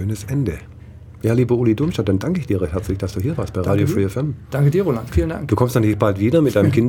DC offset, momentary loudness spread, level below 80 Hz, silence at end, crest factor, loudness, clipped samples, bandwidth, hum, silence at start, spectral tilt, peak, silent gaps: under 0.1%; 7 LU; -36 dBFS; 0 s; 18 dB; -19 LUFS; under 0.1%; 17.5 kHz; none; 0 s; -8 dB/octave; -2 dBFS; none